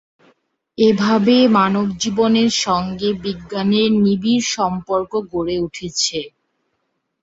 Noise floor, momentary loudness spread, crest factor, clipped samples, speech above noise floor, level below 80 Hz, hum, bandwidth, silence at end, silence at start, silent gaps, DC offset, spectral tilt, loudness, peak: -71 dBFS; 10 LU; 16 dB; under 0.1%; 55 dB; -52 dBFS; none; 8 kHz; 0.95 s; 0.8 s; none; under 0.1%; -4.5 dB/octave; -17 LUFS; -2 dBFS